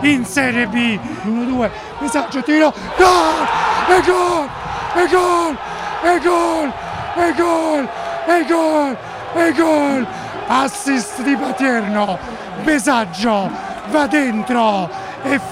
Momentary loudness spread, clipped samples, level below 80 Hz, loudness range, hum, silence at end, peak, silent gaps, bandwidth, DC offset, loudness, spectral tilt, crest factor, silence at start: 10 LU; under 0.1%; -44 dBFS; 3 LU; none; 0 s; -2 dBFS; none; 15.5 kHz; under 0.1%; -16 LUFS; -4 dB/octave; 16 dB; 0 s